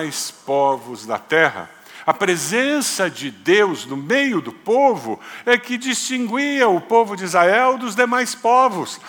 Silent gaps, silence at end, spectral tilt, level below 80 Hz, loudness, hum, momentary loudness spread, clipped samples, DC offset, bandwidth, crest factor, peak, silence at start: none; 0 s; -3 dB/octave; -74 dBFS; -18 LUFS; none; 10 LU; under 0.1%; under 0.1%; 19.5 kHz; 18 dB; 0 dBFS; 0 s